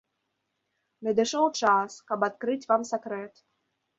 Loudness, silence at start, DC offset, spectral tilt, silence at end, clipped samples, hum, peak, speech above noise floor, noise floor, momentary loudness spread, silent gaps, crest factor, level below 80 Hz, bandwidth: -27 LUFS; 1 s; under 0.1%; -3.5 dB/octave; 0.7 s; under 0.1%; none; -10 dBFS; 53 dB; -80 dBFS; 12 LU; none; 20 dB; -74 dBFS; 8 kHz